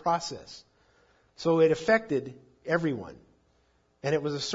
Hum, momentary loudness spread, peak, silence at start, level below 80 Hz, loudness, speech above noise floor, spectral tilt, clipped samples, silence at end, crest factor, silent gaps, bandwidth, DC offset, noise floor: none; 22 LU; -10 dBFS; 0.05 s; -66 dBFS; -28 LUFS; 41 dB; -5 dB/octave; under 0.1%; 0 s; 18 dB; none; 7.8 kHz; under 0.1%; -68 dBFS